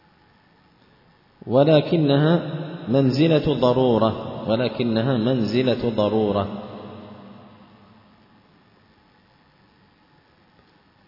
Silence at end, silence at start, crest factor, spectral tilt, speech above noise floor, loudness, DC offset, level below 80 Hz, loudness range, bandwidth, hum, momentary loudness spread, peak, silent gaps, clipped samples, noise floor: 3.75 s; 1.45 s; 18 dB; -8.5 dB/octave; 38 dB; -20 LUFS; under 0.1%; -54 dBFS; 9 LU; 5.8 kHz; none; 19 LU; -4 dBFS; none; under 0.1%; -57 dBFS